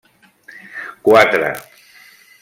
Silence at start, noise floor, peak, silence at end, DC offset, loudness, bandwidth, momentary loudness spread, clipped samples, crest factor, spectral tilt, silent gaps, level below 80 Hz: 0.75 s; -46 dBFS; 0 dBFS; 0.8 s; under 0.1%; -13 LUFS; 16.5 kHz; 20 LU; under 0.1%; 18 dB; -4.5 dB/octave; none; -60 dBFS